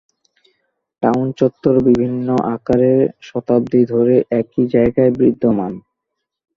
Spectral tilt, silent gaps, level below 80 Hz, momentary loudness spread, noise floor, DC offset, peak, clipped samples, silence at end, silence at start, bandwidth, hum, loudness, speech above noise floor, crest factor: -9.5 dB/octave; none; -46 dBFS; 6 LU; -78 dBFS; under 0.1%; -2 dBFS; under 0.1%; 0.8 s; 1 s; 6.8 kHz; none; -16 LUFS; 63 dB; 14 dB